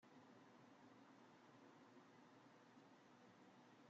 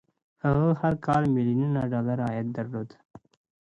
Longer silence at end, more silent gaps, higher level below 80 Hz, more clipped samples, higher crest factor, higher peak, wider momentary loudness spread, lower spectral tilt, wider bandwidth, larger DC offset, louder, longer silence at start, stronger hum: second, 0 s vs 0.45 s; second, none vs 3.05-3.09 s; second, under -90 dBFS vs -54 dBFS; neither; about the same, 14 dB vs 16 dB; second, -54 dBFS vs -12 dBFS; second, 1 LU vs 10 LU; second, -4 dB/octave vs -9.5 dB/octave; second, 7.4 kHz vs 8.2 kHz; neither; second, -68 LUFS vs -26 LUFS; second, 0 s vs 0.45 s; neither